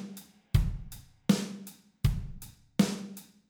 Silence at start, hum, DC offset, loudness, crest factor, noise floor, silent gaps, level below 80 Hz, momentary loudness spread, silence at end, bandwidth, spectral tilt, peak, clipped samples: 0 s; none; under 0.1%; -32 LUFS; 22 dB; -49 dBFS; none; -40 dBFS; 19 LU; 0.3 s; over 20 kHz; -6 dB/octave; -10 dBFS; under 0.1%